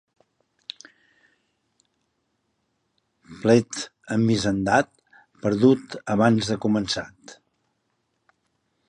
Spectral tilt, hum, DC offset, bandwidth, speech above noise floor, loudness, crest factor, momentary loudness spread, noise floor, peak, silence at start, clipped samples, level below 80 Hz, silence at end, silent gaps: -5.5 dB/octave; none; under 0.1%; 11 kHz; 52 dB; -22 LUFS; 20 dB; 20 LU; -74 dBFS; -4 dBFS; 3.3 s; under 0.1%; -56 dBFS; 1.55 s; none